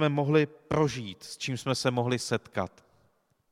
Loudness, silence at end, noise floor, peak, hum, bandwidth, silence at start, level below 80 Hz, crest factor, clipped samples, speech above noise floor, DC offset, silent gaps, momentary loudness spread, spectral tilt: -29 LUFS; 0.85 s; -69 dBFS; -10 dBFS; none; 14.5 kHz; 0 s; -60 dBFS; 20 dB; under 0.1%; 41 dB; under 0.1%; none; 11 LU; -5.5 dB/octave